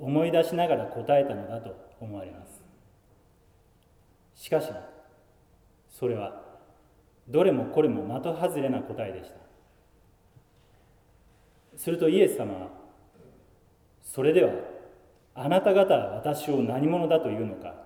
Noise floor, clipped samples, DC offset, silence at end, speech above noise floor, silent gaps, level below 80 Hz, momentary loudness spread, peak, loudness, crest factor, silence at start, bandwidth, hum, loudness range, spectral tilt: -61 dBFS; under 0.1%; under 0.1%; 0 s; 35 dB; none; -64 dBFS; 21 LU; -8 dBFS; -26 LUFS; 20 dB; 0 s; 18 kHz; none; 12 LU; -6.5 dB/octave